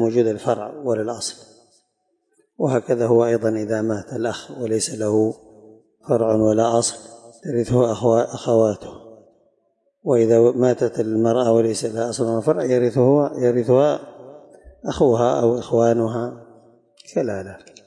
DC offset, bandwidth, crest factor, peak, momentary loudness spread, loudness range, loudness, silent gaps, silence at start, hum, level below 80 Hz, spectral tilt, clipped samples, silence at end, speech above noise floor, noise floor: under 0.1%; 11.5 kHz; 16 dB; -4 dBFS; 12 LU; 4 LU; -20 LUFS; none; 0 s; none; -56 dBFS; -6 dB/octave; under 0.1%; 0.3 s; 51 dB; -70 dBFS